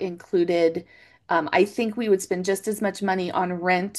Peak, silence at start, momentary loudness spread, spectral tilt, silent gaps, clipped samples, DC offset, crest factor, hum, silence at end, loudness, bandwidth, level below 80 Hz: -6 dBFS; 0 s; 5 LU; -5 dB/octave; none; under 0.1%; under 0.1%; 18 dB; none; 0 s; -24 LUFS; 12.5 kHz; -68 dBFS